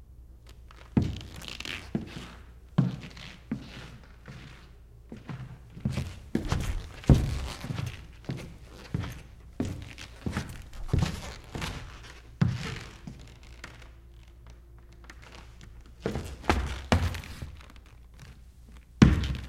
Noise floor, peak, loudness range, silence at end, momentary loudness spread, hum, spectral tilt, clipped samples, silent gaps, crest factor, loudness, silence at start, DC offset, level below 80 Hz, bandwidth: -51 dBFS; -2 dBFS; 8 LU; 0 s; 24 LU; none; -6.5 dB/octave; under 0.1%; none; 30 dB; -31 LUFS; 0 s; under 0.1%; -40 dBFS; 15.5 kHz